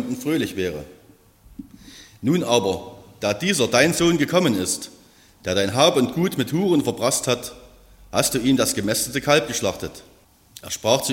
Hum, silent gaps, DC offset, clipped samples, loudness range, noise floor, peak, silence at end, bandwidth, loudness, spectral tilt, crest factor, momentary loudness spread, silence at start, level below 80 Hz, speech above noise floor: none; none; under 0.1%; under 0.1%; 4 LU; -52 dBFS; -2 dBFS; 0 s; 16.5 kHz; -21 LUFS; -4 dB/octave; 20 dB; 14 LU; 0 s; -52 dBFS; 31 dB